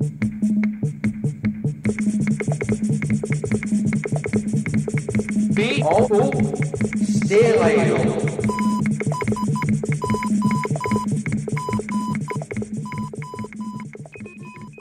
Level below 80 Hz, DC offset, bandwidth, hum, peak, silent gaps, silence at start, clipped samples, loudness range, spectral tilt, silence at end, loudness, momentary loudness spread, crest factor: -48 dBFS; under 0.1%; 11.5 kHz; none; -4 dBFS; none; 0 s; under 0.1%; 7 LU; -7 dB/octave; 0 s; -21 LUFS; 13 LU; 16 dB